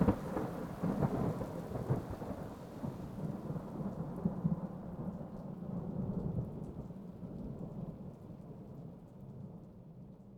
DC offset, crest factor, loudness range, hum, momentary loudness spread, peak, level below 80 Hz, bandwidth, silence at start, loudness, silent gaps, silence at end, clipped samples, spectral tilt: under 0.1%; 24 dB; 8 LU; none; 15 LU; -16 dBFS; -54 dBFS; 17.5 kHz; 0 s; -41 LUFS; none; 0 s; under 0.1%; -9 dB/octave